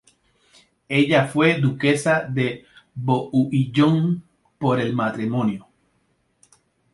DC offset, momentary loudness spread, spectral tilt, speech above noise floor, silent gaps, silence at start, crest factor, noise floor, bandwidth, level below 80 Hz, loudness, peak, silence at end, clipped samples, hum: under 0.1%; 9 LU; -6.5 dB/octave; 47 dB; none; 0.9 s; 20 dB; -67 dBFS; 11.5 kHz; -60 dBFS; -21 LUFS; -2 dBFS; 1.35 s; under 0.1%; none